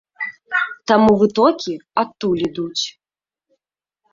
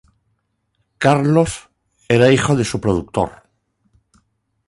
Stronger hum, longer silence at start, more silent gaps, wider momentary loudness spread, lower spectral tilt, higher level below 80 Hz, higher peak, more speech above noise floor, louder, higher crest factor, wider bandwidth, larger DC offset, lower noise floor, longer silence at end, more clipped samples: neither; second, 0.2 s vs 1 s; neither; first, 12 LU vs 9 LU; about the same, -5 dB/octave vs -6 dB/octave; second, -52 dBFS vs -44 dBFS; about the same, -2 dBFS vs -2 dBFS; first, over 73 dB vs 53 dB; about the same, -18 LUFS vs -17 LUFS; about the same, 18 dB vs 18 dB; second, 7.6 kHz vs 11.5 kHz; neither; first, under -90 dBFS vs -69 dBFS; about the same, 1.25 s vs 1.35 s; neither